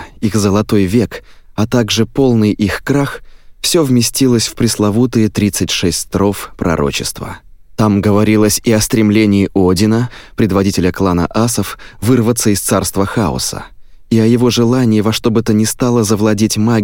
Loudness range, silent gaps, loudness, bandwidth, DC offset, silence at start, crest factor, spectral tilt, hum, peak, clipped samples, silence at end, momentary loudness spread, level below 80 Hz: 2 LU; none; -13 LUFS; 17 kHz; under 0.1%; 0 s; 12 dB; -5 dB/octave; none; 0 dBFS; under 0.1%; 0 s; 8 LU; -36 dBFS